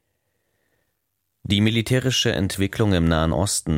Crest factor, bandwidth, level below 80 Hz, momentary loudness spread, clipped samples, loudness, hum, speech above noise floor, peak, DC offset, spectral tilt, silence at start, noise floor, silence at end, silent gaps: 18 dB; 16.5 kHz; -38 dBFS; 4 LU; under 0.1%; -21 LUFS; none; 55 dB; -6 dBFS; under 0.1%; -4.5 dB/octave; 1.5 s; -75 dBFS; 0 s; none